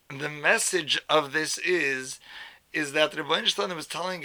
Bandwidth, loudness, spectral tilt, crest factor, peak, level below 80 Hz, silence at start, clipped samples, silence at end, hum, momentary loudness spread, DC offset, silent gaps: over 20 kHz; -25 LUFS; -2 dB/octave; 22 dB; -6 dBFS; -72 dBFS; 0.1 s; under 0.1%; 0 s; none; 12 LU; under 0.1%; none